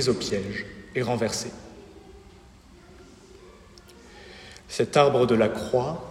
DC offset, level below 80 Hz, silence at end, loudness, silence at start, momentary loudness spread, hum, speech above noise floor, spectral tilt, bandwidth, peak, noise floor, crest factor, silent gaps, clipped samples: under 0.1%; -54 dBFS; 0 s; -25 LUFS; 0 s; 25 LU; none; 27 dB; -5 dB/octave; 15.5 kHz; -4 dBFS; -51 dBFS; 24 dB; none; under 0.1%